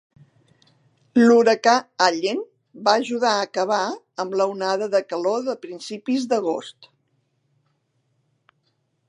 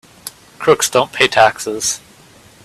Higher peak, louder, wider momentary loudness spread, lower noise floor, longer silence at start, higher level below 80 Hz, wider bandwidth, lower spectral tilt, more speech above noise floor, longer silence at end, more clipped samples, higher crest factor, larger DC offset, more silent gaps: about the same, 0 dBFS vs 0 dBFS; second, -21 LUFS vs -14 LUFS; second, 15 LU vs 22 LU; first, -70 dBFS vs -45 dBFS; first, 1.15 s vs 0.25 s; second, -78 dBFS vs -54 dBFS; second, 10.5 kHz vs 16 kHz; first, -3.5 dB/octave vs -2 dB/octave; first, 49 dB vs 31 dB; first, 2.35 s vs 0.7 s; neither; first, 22 dB vs 16 dB; neither; neither